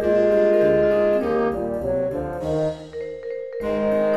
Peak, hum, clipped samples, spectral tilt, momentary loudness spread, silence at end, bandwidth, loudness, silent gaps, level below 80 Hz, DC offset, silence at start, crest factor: -8 dBFS; none; under 0.1%; -8 dB/octave; 14 LU; 0 s; 12 kHz; -21 LUFS; none; -44 dBFS; under 0.1%; 0 s; 12 dB